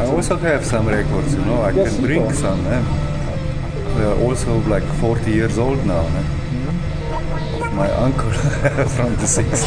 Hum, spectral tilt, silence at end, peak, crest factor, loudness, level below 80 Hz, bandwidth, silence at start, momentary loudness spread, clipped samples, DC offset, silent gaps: none; -6 dB/octave; 0 s; -2 dBFS; 14 dB; -19 LUFS; -26 dBFS; 10 kHz; 0 s; 6 LU; under 0.1%; under 0.1%; none